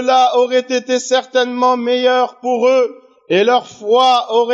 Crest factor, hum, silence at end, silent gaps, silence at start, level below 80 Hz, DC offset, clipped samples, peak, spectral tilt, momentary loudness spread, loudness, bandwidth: 12 dB; none; 0 s; none; 0 s; -78 dBFS; under 0.1%; under 0.1%; -2 dBFS; -3 dB/octave; 5 LU; -14 LUFS; 8 kHz